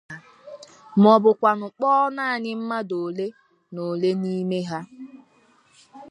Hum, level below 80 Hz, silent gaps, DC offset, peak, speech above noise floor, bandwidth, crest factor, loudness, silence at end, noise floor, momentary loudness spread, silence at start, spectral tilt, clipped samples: none; -74 dBFS; none; under 0.1%; -2 dBFS; 38 dB; 10.5 kHz; 22 dB; -22 LUFS; 0.05 s; -59 dBFS; 26 LU; 0.1 s; -7.5 dB/octave; under 0.1%